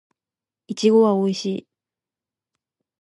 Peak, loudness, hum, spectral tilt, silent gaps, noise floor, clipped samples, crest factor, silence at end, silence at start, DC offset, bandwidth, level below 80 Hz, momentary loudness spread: -6 dBFS; -19 LUFS; none; -6 dB/octave; none; under -90 dBFS; under 0.1%; 18 dB; 1.4 s; 0.7 s; under 0.1%; 11 kHz; -76 dBFS; 16 LU